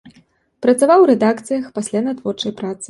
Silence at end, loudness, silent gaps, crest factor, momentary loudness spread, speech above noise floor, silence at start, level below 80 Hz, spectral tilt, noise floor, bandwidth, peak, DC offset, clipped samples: 0.05 s; -16 LUFS; none; 14 dB; 12 LU; 39 dB; 0.05 s; -62 dBFS; -5 dB/octave; -54 dBFS; 11.5 kHz; -2 dBFS; under 0.1%; under 0.1%